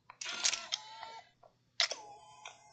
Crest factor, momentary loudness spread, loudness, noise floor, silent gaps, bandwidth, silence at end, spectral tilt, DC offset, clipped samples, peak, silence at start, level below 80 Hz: 30 dB; 20 LU; -35 LUFS; -67 dBFS; none; 9.4 kHz; 0 s; 2.5 dB/octave; under 0.1%; under 0.1%; -10 dBFS; 0.1 s; -84 dBFS